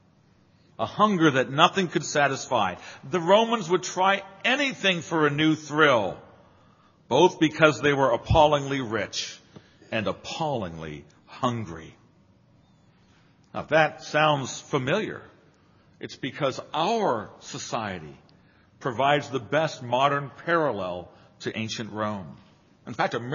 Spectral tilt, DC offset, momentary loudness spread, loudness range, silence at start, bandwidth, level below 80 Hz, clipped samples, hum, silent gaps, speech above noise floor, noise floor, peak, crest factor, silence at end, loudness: -3.5 dB/octave; under 0.1%; 17 LU; 8 LU; 0.8 s; 7.4 kHz; -52 dBFS; under 0.1%; none; none; 35 dB; -60 dBFS; -2 dBFS; 24 dB; 0 s; -24 LUFS